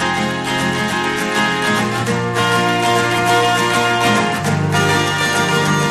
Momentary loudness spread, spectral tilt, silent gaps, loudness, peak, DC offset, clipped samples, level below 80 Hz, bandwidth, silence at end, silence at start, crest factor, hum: 4 LU; -4 dB/octave; none; -15 LUFS; -2 dBFS; under 0.1%; under 0.1%; -48 dBFS; 15.5 kHz; 0 s; 0 s; 14 dB; none